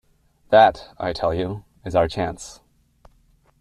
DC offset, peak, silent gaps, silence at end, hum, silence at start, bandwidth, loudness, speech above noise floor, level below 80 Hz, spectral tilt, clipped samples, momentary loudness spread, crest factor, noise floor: under 0.1%; -2 dBFS; none; 1.05 s; none; 0.5 s; 11.5 kHz; -21 LUFS; 39 dB; -48 dBFS; -5.5 dB/octave; under 0.1%; 18 LU; 20 dB; -59 dBFS